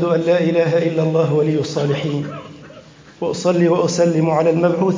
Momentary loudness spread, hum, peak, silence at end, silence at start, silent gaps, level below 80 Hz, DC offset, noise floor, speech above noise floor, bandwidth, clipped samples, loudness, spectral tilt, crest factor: 10 LU; none; -4 dBFS; 0 s; 0 s; none; -58 dBFS; under 0.1%; -42 dBFS; 25 dB; 7.6 kHz; under 0.1%; -17 LUFS; -6.5 dB/octave; 14 dB